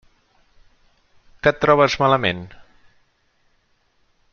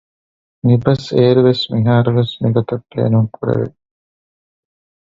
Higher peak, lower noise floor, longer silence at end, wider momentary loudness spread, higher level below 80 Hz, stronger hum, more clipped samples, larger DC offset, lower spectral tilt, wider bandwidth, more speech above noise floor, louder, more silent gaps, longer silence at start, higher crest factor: about the same, -2 dBFS vs 0 dBFS; second, -63 dBFS vs under -90 dBFS; first, 1.85 s vs 1.45 s; first, 14 LU vs 8 LU; about the same, -50 dBFS vs -50 dBFS; neither; neither; neither; second, -5.5 dB/octave vs -8.5 dB/octave; about the same, 7 kHz vs 7.4 kHz; second, 46 dB vs over 76 dB; second, -18 LUFS vs -15 LUFS; neither; first, 1.45 s vs 0.65 s; first, 22 dB vs 16 dB